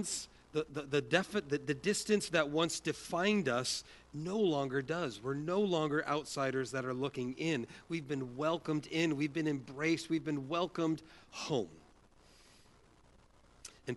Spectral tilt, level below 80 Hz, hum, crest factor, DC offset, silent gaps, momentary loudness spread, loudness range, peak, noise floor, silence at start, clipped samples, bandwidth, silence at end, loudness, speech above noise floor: -4.5 dB/octave; -68 dBFS; none; 22 dB; under 0.1%; none; 9 LU; 4 LU; -14 dBFS; -64 dBFS; 0 s; under 0.1%; 11.5 kHz; 0 s; -35 LUFS; 28 dB